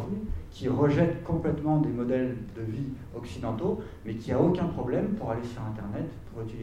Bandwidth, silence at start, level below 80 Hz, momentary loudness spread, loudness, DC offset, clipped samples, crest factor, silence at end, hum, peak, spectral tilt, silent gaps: 11 kHz; 0 s; -46 dBFS; 13 LU; -30 LUFS; under 0.1%; under 0.1%; 18 dB; 0 s; none; -10 dBFS; -9 dB/octave; none